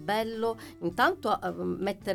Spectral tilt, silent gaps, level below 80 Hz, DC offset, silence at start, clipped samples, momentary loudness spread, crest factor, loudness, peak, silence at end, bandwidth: -5.5 dB/octave; none; -60 dBFS; under 0.1%; 0 s; under 0.1%; 7 LU; 18 dB; -30 LUFS; -12 dBFS; 0 s; 18 kHz